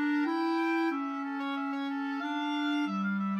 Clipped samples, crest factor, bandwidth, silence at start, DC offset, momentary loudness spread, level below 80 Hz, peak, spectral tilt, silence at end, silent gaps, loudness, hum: under 0.1%; 12 dB; 8.8 kHz; 0 s; under 0.1%; 5 LU; under -90 dBFS; -20 dBFS; -6.5 dB/octave; 0 s; none; -32 LUFS; none